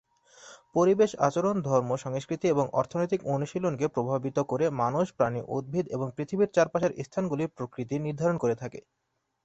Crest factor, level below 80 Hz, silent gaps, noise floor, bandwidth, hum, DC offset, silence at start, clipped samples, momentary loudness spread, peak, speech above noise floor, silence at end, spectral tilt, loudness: 20 dB; -64 dBFS; none; -53 dBFS; 8.2 kHz; none; under 0.1%; 0.4 s; under 0.1%; 8 LU; -8 dBFS; 26 dB; 0.65 s; -7 dB/octave; -28 LUFS